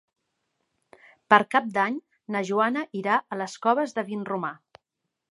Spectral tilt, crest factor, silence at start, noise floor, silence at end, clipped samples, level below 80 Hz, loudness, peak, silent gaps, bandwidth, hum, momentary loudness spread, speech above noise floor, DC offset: -5 dB/octave; 26 dB; 1.3 s; -83 dBFS; 0.75 s; under 0.1%; -78 dBFS; -25 LUFS; -2 dBFS; none; 11.5 kHz; none; 12 LU; 58 dB; under 0.1%